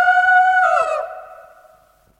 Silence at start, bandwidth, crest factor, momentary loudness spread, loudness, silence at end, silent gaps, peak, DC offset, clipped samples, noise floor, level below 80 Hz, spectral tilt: 0 s; 10 kHz; 14 dB; 18 LU; -15 LUFS; 0.85 s; none; -4 dBFS; under 0.1%; under 0.1%; -53 dBFS; -60 dBFS; 0 dB/octave